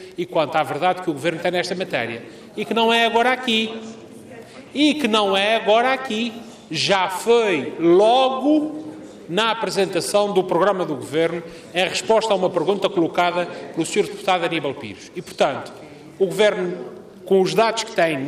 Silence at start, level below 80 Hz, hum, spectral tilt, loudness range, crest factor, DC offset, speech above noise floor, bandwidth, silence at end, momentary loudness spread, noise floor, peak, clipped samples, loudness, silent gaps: 0 s; -64 dBFS; none; -4 dB/octave; 4 LU; 16 dB; under 0.1%; 20 dB; 15.5 kHz; 0 s; 17 LU; -40 dBFS; -4 dBFS; under 0.1%; -20 LUFS; none